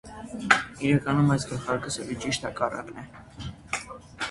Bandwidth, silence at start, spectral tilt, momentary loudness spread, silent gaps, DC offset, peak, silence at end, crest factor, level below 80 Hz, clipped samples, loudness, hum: 11.5 kHz; 0.05 s; -5 dB/octave; 18 LU; none; under 0.1%; 0 dBFS; 0 s; 28 dB; -52 dBFS; under 0.1%; -27 LUFS; none